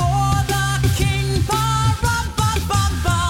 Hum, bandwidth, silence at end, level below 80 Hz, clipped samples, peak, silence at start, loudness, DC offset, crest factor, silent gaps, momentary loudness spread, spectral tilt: none; 17 kHz; 0 s; -26 dBFS; under 0.1%; -6 dBFS; 0 s; -19 LUFS; under 0.1%; 12 dB; none; 2 LU; -4.5 dB/octave